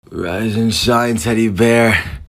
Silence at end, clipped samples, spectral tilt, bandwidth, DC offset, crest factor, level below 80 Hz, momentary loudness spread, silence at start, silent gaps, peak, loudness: 0.05 s; under 0.1%; -5 dB/octave; 16 kHz; under 0.1%; 14 dB; -36 dBFS; 7 LU; 0.1 s; none; -2 dBFS; -14 LUFS